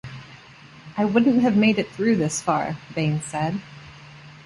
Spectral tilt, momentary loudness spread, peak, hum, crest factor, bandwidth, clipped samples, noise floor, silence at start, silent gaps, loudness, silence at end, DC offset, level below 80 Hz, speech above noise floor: -5.5 dB/octave; 22 LU; -6 dBFS; none; 16 dB; 11.5 kHz; under 0.1%; -46 dBFS; 0.05 s; none; -22 LUFS; 0.05 s; under 0.1%; -56 dBFS; 25 dB